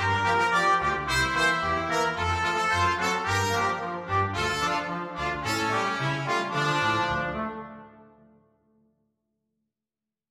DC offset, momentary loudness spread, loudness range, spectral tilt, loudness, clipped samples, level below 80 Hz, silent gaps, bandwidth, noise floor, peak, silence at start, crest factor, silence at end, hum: under 0.1%; 8 LU; 7 LU; -4 dB/octave; -25 LUFS; under 0.1%; -48 dBFS; none; 16 kHz; -90 dBFS; -12 dBFS; 0 s; 16 dB; 2.3 s; none